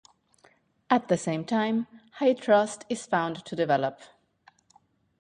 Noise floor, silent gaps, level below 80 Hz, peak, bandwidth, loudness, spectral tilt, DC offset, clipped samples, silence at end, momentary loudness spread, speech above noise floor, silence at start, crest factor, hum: -64 dBFS; none; -70 dBFS; -8 dBFS; 11 kHz; -27 LUFS; -5.5 dB/octave; under 0.1%; under 0.1%; 1.15 s; 9 LU; 38 dB; 0.9 s; 20 dB; none